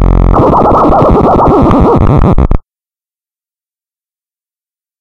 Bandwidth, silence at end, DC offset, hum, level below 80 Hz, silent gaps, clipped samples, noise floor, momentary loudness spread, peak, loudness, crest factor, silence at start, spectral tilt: 6.6 kHz; 2.4 s; under 0.1%; none; -14 dBFS; none; 1%; under -90 dBFS; 4 LU; 0 dBFS; -7 LUFS; 8 dB; 0 s; -10 dB/octave